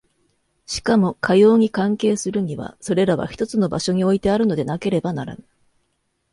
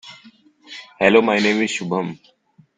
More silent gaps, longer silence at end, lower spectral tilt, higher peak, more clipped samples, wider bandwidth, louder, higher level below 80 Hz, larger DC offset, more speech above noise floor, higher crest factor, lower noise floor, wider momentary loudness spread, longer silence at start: neither; first, 1 s vs 0.65 s; first, -6 dB/octave vs -4.5 dB/octave; about the same, -4 dBFS vs -2 dBFS; neither; first, 11.5 kHz vs 9.4 kHz; about the same, -19 LUFS vs -18 LUFS; first, -50 dBFS vs -60 dBFS; neither; first, 51 dB vs 32 dB; about the same, 16 dB vs 20 dB; first, -70 dBFS vs -50 dBFS; second, 12 LU vs 23 LU; first, 0.7 s vs 0.05 s